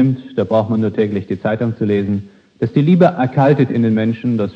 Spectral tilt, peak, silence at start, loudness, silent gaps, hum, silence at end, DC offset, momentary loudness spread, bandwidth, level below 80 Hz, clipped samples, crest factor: -10 dB/octave; 0 dBFS; 0 s; -16 LUFS; none; none; 0 s; under 0.1%; 8 LU; 6.6 kHz; -56 dBFS; under 0.1%; 16 dB